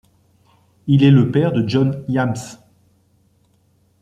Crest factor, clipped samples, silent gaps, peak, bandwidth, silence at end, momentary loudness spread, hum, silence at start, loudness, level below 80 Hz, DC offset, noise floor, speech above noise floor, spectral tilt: 16 dB; under 0.1%; none; -2 dBFS; 9.4 kHz; 1.45 s; 17 LU; none; 0.85 s; -16 LUFS; -54 dBFS; under 0.1%; -59 dBFS; 44 dB; -8 dB/octave